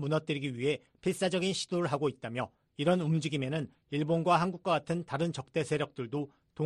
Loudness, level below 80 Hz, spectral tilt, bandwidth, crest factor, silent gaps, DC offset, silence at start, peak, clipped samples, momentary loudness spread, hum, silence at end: -32 LUFS; -68 dBFS; -6 dB/octave; 11.5 kHz; 18 dB; none; under 0.1%; 0 s; -14 dBFS; under 0.1%; 9 LU; none; 0 s